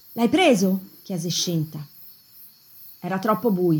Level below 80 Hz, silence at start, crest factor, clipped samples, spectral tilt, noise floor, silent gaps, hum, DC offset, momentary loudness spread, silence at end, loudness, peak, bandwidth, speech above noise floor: -68 dBFS; 0.1 s; 18 dB; under 0.1%; -5 dB/octave; -49 dBFS; none; none; under 0.1%; 25 LU; 0 s; -22 LUFS; -6 dBFS; 19 kHz; 28 dB